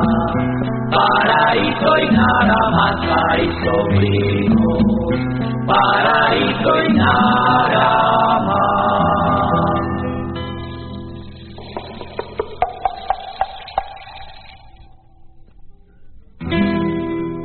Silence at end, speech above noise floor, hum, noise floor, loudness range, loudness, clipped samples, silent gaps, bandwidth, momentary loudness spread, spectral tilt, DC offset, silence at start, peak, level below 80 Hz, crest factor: 0 s; 28 dB; none; -43 dBFS; 12 LU; -16 LUFS; under 0.1%; none; 4.5 kHz; 17 LU; -4 dB/octave; under 0.1%; 0 s; 0 dBFS; -36 dBFS; 16 dB